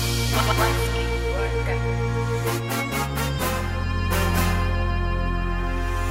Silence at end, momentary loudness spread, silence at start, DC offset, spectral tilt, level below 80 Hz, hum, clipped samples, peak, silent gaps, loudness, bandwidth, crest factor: 0 s; 5 LU; 0 s; under 0.1%; -5 dB/octave; -28 dBFS; none; under 0.1%; -6 dBFS; none; -24 LUFS; 16.5 kHz; 16 dB